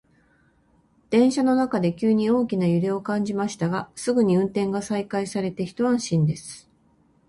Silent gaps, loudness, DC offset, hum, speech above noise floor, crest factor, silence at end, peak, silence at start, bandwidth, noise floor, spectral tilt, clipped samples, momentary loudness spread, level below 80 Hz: none; -23 LUFS; under 0.1%; none; 39 dB; 16 dB; 0.7 s; -8 dBFS; 1.1 s; 11.5 kHz; -61 dBFS; -6.5 dB/octave; under 0.1%; 7 LU; -60 dBFS